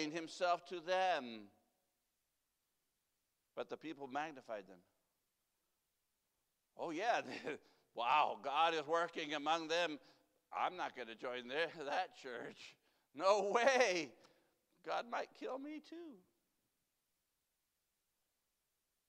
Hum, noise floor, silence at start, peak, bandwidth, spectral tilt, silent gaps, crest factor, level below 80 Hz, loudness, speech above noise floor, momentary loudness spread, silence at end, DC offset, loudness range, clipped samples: none; -87 dBFS; 0 s; -18 dBFS; 14.5 kHz; -2.5 dB/octave; none; 24 dB; under -90 dBFS; -39 LUFS; 47 dB; 18 LU; 2.95 s; under 0.1%; 13 LU; under 0.1%